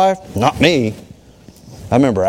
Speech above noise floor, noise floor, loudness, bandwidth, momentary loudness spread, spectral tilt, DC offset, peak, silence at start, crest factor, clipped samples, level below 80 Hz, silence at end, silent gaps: 29 dB; -43 dBFS; -15 LUFS; 16.5 kHz; 19 LU; -6 dB/octave; under 0.1%; 0 dBFS; 0 s; 16 dB; under 0.1%; -42 dBFS; 0 s; none